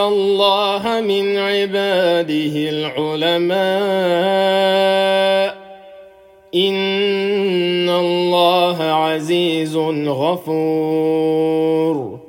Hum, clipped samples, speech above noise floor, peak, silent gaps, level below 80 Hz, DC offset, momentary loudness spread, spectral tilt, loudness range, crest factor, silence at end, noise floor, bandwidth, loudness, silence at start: none; under 0.1%; 28 dB; -2 dBFS; none; -64 dBFS; under 0.1%; 5 LU; -5.5 dB/octave; 1 LU; 14 dB; 0.05 s; -45 dBFS; 17 kHz; -16 LUFS; 0 s